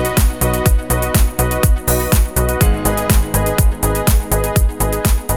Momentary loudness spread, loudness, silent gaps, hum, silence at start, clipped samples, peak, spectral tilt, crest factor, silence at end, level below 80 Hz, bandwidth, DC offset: 2 LU; -16 LUFS; none; none; 0 s; under 0.1%; 0 dBFS; -5 dB/octave; 14 dB; 0 s; -16 dBFS; 19 kHz; 1%